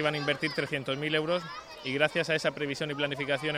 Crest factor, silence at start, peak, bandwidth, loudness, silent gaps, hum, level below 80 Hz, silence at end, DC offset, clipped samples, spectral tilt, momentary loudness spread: 20 dB; 0 s; -10 dBFS; 15.5 kHz; -30 LUFS; none; none; -66 dBFS; 0 s; under 0.1%; under 0.1%; -4.5 dB/octave; 6 LU